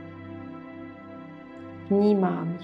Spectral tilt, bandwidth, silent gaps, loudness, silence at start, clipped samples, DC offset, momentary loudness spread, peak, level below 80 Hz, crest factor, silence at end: -10 dB/octave; 5 kHz; none; -24 LUFS; 0 s; under 0.1%; under 0.1%; 21 LU; -12 dBFS; -70 dBFS; 16 dB; 0 s